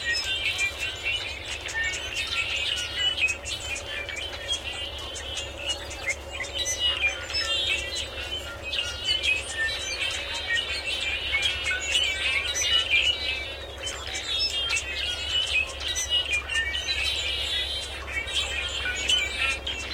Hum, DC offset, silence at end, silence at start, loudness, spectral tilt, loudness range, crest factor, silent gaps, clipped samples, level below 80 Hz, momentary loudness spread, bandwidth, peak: none; under 0.1%; 0 s; 0 s; -26 LUFS; -0.5 dB/octave; 4 LU; 18 dB; none; under 0.1%; -44 dBFS; 9 LU; 16.5 kHz; -10 dBFS